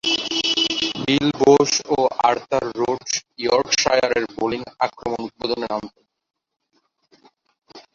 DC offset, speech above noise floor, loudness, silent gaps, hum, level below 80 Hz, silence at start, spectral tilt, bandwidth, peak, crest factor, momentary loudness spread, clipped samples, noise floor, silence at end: under 0.1%; 47 dB; -20 LUFS; none; none; -54 dBFS; 0.05 s; -3 dB/octave; 7.8 kHz; -2 dBFS; 20 dB; 10 LU; under 0.1%; -68 dBFS; 0.15 s